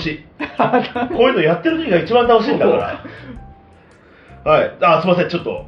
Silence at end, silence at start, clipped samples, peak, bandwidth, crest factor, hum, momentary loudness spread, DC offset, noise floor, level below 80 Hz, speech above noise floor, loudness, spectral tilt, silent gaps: 0 s; 0 s; under 0.1%; -2 dBFS; 6.2 kHz; 16 dB; none; 14 LU; under 0.1%; -46 dBFS; -46 dBFS; 30 dB; -15 LUFS; -7.5 dB/octave; none